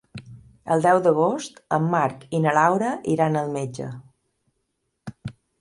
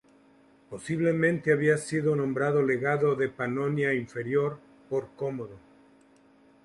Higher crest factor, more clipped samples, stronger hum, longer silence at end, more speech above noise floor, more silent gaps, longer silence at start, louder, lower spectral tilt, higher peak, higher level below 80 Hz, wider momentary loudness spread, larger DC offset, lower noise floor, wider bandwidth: about the same, 20 dB vs 18 dB; neither; neither; second, 0.3 s vs 1.05 s; first, 54 dB vs 32 dB; neither; second, 0.15 s vs 0.7 s; first, -22 LUFS vs -27 LUFS; about the same, -6.5 dB/octave vs -7 dB/octave; first, -4 dBFS vs -10 dBFS; first, -62 dBFS vs -68 dBFS; first, 23 LU vs 10 LU; neither; first, -75 dBFS vs -59 dBFS; about the same, 11.5 kHz vs 11.5 kHz